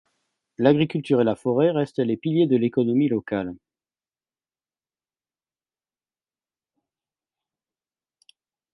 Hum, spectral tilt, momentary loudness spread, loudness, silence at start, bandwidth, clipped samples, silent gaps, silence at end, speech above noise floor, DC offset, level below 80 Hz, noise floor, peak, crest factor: none; -8.5 dB/octave; 6 LU; -22 LUFS; 0.6 s; 11 kHz; under 0.1%; none; 5.2 s; over 69 dB; under 0.1%; -64 dBFS; under -90 dBFS; -4 dBFS; 22 dB